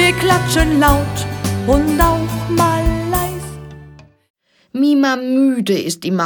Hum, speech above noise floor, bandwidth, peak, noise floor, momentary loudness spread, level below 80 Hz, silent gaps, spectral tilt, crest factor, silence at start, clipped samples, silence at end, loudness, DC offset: none; 27 dB; 19.5 kHz; 0 dBFS; -41 dBFS; 10 LU; -26 dBFS; 4.30-4.34 s; -5 dB/octave; 16 dB; 0 s; under 0.1%; 0 s; -15 LUFS; under 0.1%